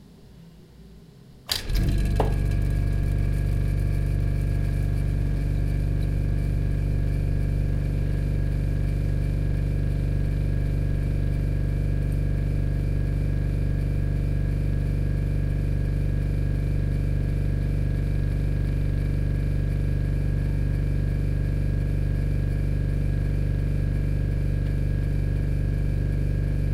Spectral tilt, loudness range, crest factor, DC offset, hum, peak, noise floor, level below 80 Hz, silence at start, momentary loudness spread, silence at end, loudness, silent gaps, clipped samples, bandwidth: -7.5 dB/octave; 0 LU; 16 dB; under 0.1%; none; -8 dBFS; -48 dBFS; -26 dBFS; 0.1 s; 1 LU; 0 s; -26 LUFS; none; under 0.1%; 14 kHz